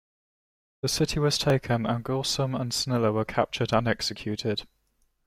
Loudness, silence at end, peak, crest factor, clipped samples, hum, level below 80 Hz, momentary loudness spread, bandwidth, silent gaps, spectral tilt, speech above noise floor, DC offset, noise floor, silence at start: -27 LUFS; 0.6 s; -10 dBFS; 18 dB; under 0.1%; none; -50 dBFS; 6 LU; 16 kHz; none; -4.5 dB/octave; 44 dB; under 0.1%; -70 dBFS; 0.85 s